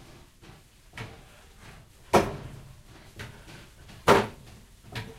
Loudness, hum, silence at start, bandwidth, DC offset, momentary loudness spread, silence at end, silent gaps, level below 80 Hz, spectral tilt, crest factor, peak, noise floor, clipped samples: -25 LUFS; none; 0.95 s; 16 kHz; under 0.1%; 28 LU; 0.05 s; none; -50 dBFS; -5 dB/octave; 28 dB; -4 dBFS; -53 dBFS; under 0.1%